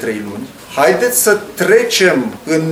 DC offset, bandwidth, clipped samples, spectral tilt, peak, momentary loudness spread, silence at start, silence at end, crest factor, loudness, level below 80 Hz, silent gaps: under 0.1%; 17 kHz; under 0.1%; -3 dB/octave; 0 dBFS; 13 LU; 0 s; 0 s; 14 dB; -12 LUFS; -54 dBFS; none